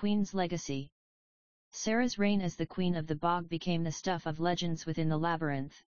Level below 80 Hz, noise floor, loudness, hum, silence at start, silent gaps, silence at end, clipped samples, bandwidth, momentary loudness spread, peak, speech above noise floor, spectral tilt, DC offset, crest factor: -60 dBFS; under -90 dBFS; -33 LUFS; none; 0 s; 0.92-1.71 s; 0.1 s; under 0.1%; 7.2 kHz; 7 LU; -16 dBFS; over 58 dB; -5.5 dB/octave; 0.5%; 18 dB